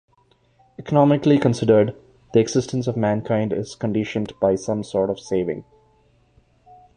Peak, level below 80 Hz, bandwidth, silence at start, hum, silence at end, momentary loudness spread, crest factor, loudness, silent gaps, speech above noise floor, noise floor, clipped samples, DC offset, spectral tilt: -4 dBFS; -54 dBFS; 10 kHz; 0.8 s; none; 1.35 s; 9 LU; 18 dB; -21 LUFS; none; 40 dB; -60 dBFS; under 0.1%; under 0.1%; -7 dB/octave